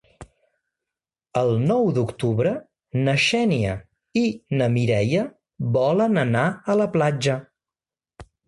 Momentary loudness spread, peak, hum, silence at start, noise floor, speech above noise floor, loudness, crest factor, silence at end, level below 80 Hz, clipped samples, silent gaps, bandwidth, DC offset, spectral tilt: 9 LU; -6 dBFS; none; 0.2 s; under -90 dBFS; over 69 dB; -22 LUFS; 16 dB; 0.25 s; -52 dBFS; under 0.1%; none; 11.5 kHz; under 0.1%; -6.5 dB/octave